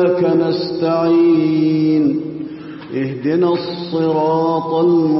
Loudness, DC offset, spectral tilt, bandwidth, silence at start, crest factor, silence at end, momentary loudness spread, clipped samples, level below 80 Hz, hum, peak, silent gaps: -16 LUFS; under 0.1%; -11.5 dB/octave; 5.8 kHz; 0 s; 10 dB; 0 s; 11 LU; under 0.1%; -58 dBFS; none; -4 dBFS; none